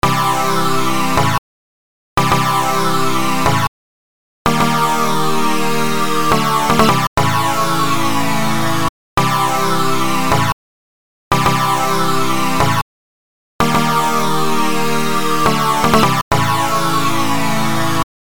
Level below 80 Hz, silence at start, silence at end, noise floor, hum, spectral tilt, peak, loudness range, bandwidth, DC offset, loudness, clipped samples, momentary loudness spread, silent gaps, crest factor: -38 dBFS; 0 s; 0.25 s; under -90 dBFS; none; -4.5 dB/octave; 0 dBFS; 2 LU; over 20 kHz; 10%; -15 LUFS; under 0.1%; 4 LU; 1.38-2.16 s, 3.68-4.45 s, 7.07-7.16 s, 8.89-9.17 s, 10.53-11.31 s, 12.82-13.59 s, 16.22-16.31 s; 16 dB